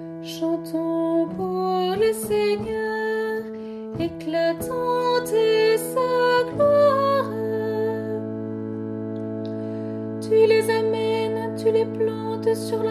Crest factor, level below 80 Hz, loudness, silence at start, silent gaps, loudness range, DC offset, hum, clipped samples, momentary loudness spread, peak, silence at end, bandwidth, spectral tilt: 16 dB; -58 dBFS; -23 LUFS; 0 s; none; 4 LU; under 0.1%; none; under 0.1%; 12 LU; -6 dBFS; 0 s; 13.5 kHz; -5.5 dB/octave